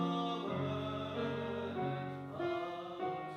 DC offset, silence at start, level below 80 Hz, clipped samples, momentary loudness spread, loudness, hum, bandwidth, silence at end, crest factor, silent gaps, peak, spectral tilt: under 0.1%; 0 s; -76 dBFS; under 0.1%; 4 LU; -39 LUFS; none; 9.4 kHz; 0 s; 14 dB; none; -24 dBFS; -7.5 dB/octave